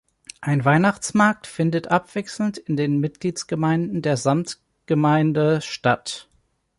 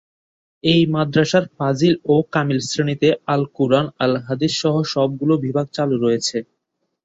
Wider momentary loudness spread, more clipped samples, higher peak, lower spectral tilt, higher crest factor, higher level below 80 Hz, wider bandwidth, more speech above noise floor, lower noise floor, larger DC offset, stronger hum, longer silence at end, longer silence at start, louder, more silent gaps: first, 9 LU vs 5 LU; neither; about the same, -4 dBFS vs -2 dBFS; about the same, -6 dB/octave vs -5.5 dB/octave; about the same, 18 dB vs 16 dB; about the same, -60 dBFS vs -58 dBFS; first, 11.5 kHz vs 8 kHz; second, 44 dB vs 56 dB; second, -65 dBFS vs -74 dBFS; neither; neither; about the same, 0.6 s vs 0.6 s; second, 0.4 s vs 0.65 s; about the same, -21 LUFS vs -19 LUFS; neither